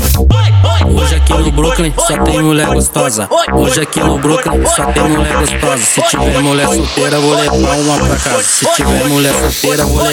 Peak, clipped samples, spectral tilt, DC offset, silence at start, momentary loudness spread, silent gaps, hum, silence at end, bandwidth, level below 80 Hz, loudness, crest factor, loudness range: 0 dBFS; under 0.1%; -4 dB/octave; under 0.1%; 0 s; 3 LU; none; none; 0 s; 17.5 kHz; -18 dBFS; -10 LUFS; 10 dB; 1 LU